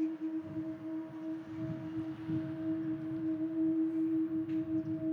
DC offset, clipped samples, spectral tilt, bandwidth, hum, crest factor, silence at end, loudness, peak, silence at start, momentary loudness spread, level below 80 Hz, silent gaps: under 0.1%; under 0.1%; -10 dB/octave; 4.2 kHz; none; 10 dB; 0 s; -37 LUFS; -26 dBFS; 0 s; 9 LU; -72 dBFS; none